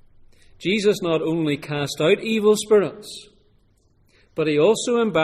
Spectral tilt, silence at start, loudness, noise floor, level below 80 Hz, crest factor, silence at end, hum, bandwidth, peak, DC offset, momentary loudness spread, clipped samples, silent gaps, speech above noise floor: -5 dB/octave; 0.6 s; -20 LUFS; -60 dBFS; -58 dBFS; 16 dB; 0 s; none; 14.5 kHz; -6 dBFS; under 0.1%; 13 LU; under 0.1%; none; 40 dB